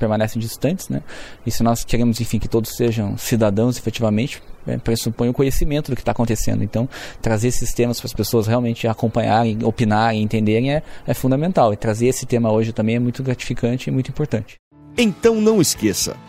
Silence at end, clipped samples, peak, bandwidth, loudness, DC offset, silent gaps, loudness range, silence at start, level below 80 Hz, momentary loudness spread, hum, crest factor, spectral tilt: 0 s; under 0.1%; 0 dBFS; 16 kHz; -20 LUFS; under 0.1%; 14.59-14.71 s; 3 LU; 0 s; -34 dBFS; 8 LU; none; 18 dB; -5.5 dB/octave